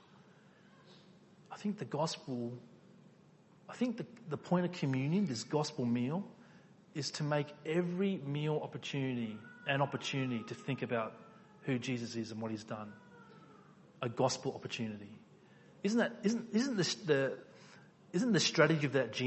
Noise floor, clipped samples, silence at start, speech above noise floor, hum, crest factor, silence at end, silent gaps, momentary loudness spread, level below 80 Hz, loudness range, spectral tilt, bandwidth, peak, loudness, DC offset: -63 dBFS; under 0.1%; 0.85 s; 28 dB; none; 24 dB; 0 s; none; 13 LU; -78 dBFS; 7 LU; -5 dB/octave; 8.2 kHz; -12 dBFS; -36 LUFS; under 0.1%